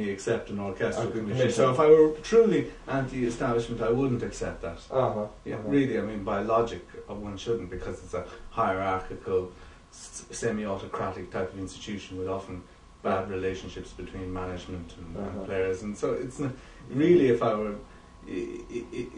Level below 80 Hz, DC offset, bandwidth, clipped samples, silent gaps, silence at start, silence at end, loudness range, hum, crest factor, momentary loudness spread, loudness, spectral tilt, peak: -50 dBFS; under 0.1%; 10.5 kHz; under 0.1%; none; 0 s; 0 s; 10 LU; none; 20 dB; 17 LU; -28 LUFS; -6.5 dB/octave; -8 dBFS